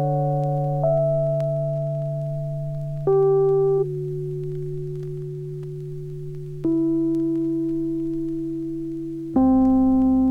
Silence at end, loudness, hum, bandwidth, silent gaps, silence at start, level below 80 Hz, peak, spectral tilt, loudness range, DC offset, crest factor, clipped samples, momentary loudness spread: 0 s; -23 LUFS; none; 3.2 kHz; none; 0 s; -46 dBFS; -10 dBFS; -11.5 dB/octave; 5 LU; under 0.1%; 12 dB; under 0.1%; 14 LU